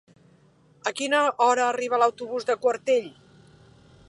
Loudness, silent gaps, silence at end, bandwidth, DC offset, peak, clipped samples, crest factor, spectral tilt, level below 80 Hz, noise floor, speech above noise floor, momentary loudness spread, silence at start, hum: -24 LUFS; none; 1 s; 11.5 kHz; under 0.1%; -8 dBFS; under 0.1%; 18 dB; -2.5 dB/octave; -70 dBFS; -58 dBFS; 35 dB; 10 LU; 0.85 s; none